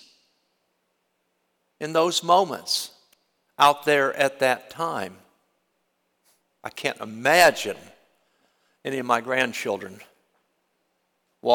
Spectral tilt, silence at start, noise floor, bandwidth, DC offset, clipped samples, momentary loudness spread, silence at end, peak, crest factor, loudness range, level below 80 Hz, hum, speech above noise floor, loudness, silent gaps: -2.5 dB/octave; 1.8 s; -73 dBFS; 19 kHz; under 0.1%; under 0.1%; 19 LU; 0 s; -6 dBFS; 20 dB; 7 LU; -72 dBFS; none; 51 dB; -22 LUFS; none